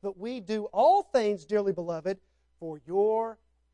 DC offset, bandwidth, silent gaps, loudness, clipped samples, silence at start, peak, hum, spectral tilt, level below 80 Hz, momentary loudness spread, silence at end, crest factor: under 0.1%; 9.8 kHz; none; -28 LUFS; under 0.1%; 0.05 s; -12 dBFS; none; -6 dB/octave; -70 dBFS; 17 LU; 0.4 s; 16 dB